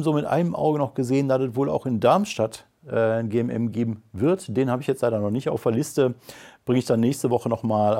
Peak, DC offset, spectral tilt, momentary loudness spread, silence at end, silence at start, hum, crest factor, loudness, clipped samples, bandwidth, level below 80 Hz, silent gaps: -6 dBFS; under 0.1%; -7 dB/octave; 6 LU; 0 s; 0 s; none; 18 dB; -23 LUFS; under 0.1%; 16.5 kHz; -62 dBFS; none